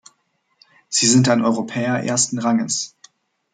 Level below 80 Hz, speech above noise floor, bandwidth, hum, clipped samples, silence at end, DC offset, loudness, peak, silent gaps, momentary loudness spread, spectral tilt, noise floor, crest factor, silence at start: -64 dBFS; 49 dB; 9.6 kHz; none; under 0.1%; 0.65 s; under 0.1%; -18 LUFS; -2 dBFS; none; 9 LU; -3.5 dB/octave; -67 dBFS; 18 dB; 0.9 s